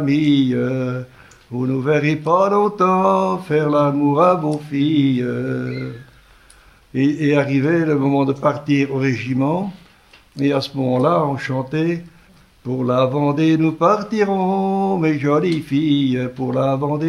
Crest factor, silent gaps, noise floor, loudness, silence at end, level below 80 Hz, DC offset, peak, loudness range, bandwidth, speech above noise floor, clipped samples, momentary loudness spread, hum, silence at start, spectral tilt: 16 dB; none; -49 dBFS; -18 LUFS; 0 s; -56 dBFS; under 0.1%; -2 dBFS; 4 LU; 11.5 kHz; 32 dB; under 0.1%; 8 LU; none; 0 s; -8 dB/octave